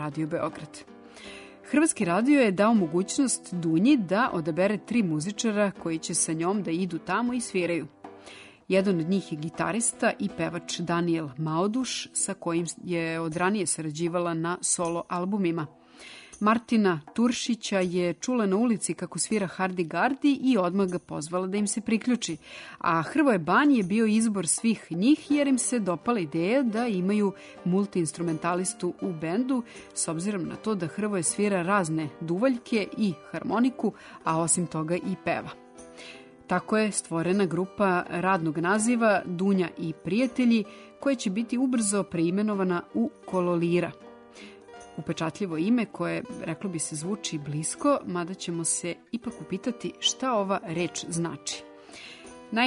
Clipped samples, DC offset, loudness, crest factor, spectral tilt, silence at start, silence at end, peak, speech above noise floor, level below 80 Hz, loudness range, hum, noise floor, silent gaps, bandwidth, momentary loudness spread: under 0.1%; under 0.1%; -27 LUFS; 16 dB; -4.5 dB/octave; 0 s; 0 s; -12 dBFS; 22 dB; -66 dBFS; 5 LU; none; -48 dBFS; none; 11 kHz; 11 LU